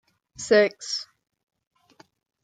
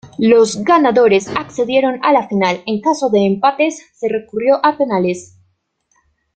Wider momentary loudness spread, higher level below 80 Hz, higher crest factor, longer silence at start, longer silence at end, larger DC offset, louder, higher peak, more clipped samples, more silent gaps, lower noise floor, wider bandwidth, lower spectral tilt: first, 19 LU vs 9 LU; second, -70 dBFS vs -56 dBFS; first, 20 dB vs 14 dB; first, 0.4 s vs 0.05 s; first, 1.4 s vs 1.1 s; neither; second, -23 LUFS vs -14 LUFS; second, -6 dBFS vs 0 dBFS; neither; neither; second, -58 dBFS vs -63 dBFS; about the same, 9.4 kHz vs 9.2 kHz; second, -3 dB/octave vs -5 dB/octave